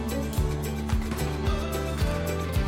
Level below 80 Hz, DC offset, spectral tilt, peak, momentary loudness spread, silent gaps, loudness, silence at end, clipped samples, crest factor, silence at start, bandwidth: -32 dBFS; under 0.1%; -6 dB/octave; -14 dBFS; 2 LU; none; -29 LUFS; 0 s; under 0.1%; 12 dB; 0 s; 16.5 kHz